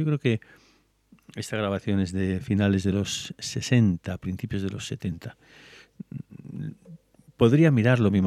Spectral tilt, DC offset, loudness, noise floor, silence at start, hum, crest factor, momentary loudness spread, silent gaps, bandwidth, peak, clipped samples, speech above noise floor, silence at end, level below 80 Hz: -6.5 dB/octave; under 0.1%; -25 LUFS; -63 dBFS; 0 s; none; 20 dB; 20 LU; none; 13 kHz; -6 dBFS; under 0.1%; 38 dB; 0 s; -56 dBFS